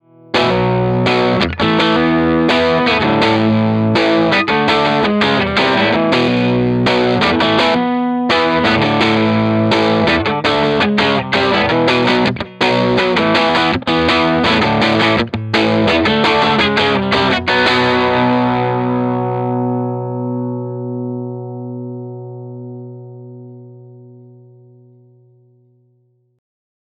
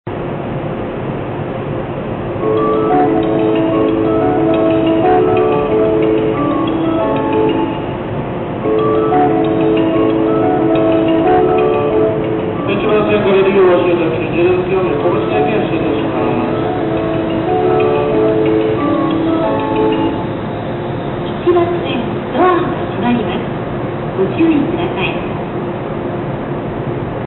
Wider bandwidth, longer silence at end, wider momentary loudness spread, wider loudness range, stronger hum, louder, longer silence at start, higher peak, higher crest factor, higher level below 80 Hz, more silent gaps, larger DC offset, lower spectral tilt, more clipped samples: first, 10.5 kHz vs 4.2 kHz; first, 2.75 s vs 0 s; about the same, 11 LU vs 9 LU; first, 11 LU vs 4 LU; first, 60 Hz at -45 dBFS vs none; about the same, -13 LUFS vs -14 LUFS; first, 0.35 s vs 0.05 s; first, 0 dBFS vs -4 dBFS; about the same, 14 dB vs 10 dB; about the same, -42 dBFS vs -38 dBFS; neither; neither; second, -6 dB/octave vs -12.5 dB/octave; neither